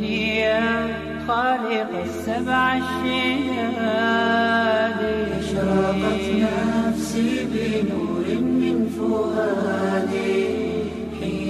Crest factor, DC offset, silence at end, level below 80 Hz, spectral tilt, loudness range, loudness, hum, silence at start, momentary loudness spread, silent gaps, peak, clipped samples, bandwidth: 14 dB; under 0.1%; 0 s; -46 dBFS; -5.5 dB/octave; 2 LU; -22 LUFS; none; 0 s; 6 LU; none; -8 dBFS; under 0.1%; 13.5 kHz